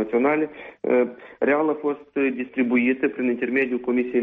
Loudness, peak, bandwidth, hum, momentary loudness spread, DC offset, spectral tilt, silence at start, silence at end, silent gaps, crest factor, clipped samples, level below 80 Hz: -23 LUFS; -8 dBFS; 3.8 kHz; none; 6 LU; under 0.1%; -4.5 dB/octave; 0 s; 0 s; none; 14 dB; under 0.1%; -66 dBFS